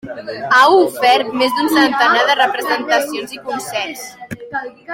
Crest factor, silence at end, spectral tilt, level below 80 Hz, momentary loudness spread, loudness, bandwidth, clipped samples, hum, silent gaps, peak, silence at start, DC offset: 14 dB; 0 s; -2.5 dB/octave; -60 dBFS; 15 LU; -14 LUFS; 17 kHz; under 0.1%; none; none; 0 dBFS; 0.05 s; under 0.1%